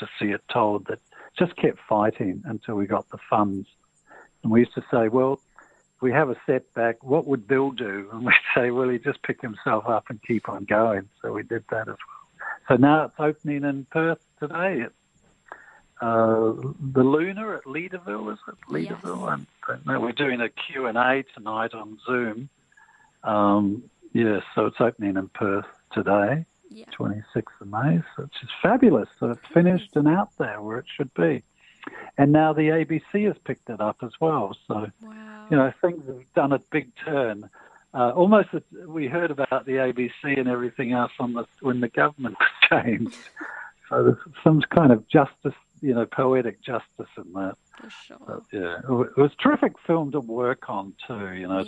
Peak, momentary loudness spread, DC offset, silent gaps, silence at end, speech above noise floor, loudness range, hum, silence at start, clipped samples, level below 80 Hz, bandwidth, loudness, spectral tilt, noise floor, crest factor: -2 dBFS; 16 LU; under 0.1%; none; 0 s; 39 dB; 5 LU; none; 0 s; under 0.1%; -64 dBFS; 8.6 kHz; -24 LUFS; -8 dB/octave; -63 dBFS; 22 dB